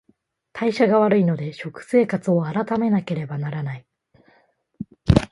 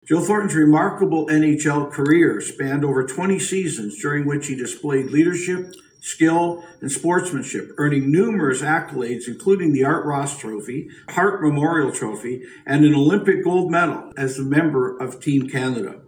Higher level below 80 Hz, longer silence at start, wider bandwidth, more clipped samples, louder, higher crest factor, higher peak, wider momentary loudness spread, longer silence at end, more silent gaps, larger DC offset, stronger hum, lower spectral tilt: first, -40 dBFS vs -62 dBFS; first, 0.55 s vs 0.05 s; second, 11.5 kHz vs 15.5 kHz; neither; about the same, -21 LUFS vs -20 LUFS; about the same, 22 dB vs 18 dB; about the same, 0 dBFS vs -2 dBFS; first, 17 LU vs 11 LU; about the same, 0.05 s vs 0.1 s; neither; neither; neither; first, -8 dB/octave vs -6 dB/octave